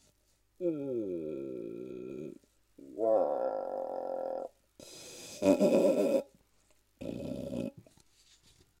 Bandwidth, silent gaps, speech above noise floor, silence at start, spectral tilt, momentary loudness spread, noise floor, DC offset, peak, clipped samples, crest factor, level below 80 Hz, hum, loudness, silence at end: 16 kHz; none; 43 dB; 0.6 s; -6.5 dB/octave; 20 LU; -71 dBFS; under 0.1%; -12 dBFS; under 0.1%; 22 dB; -68 dBFS; none; -33 LUFS; 1 s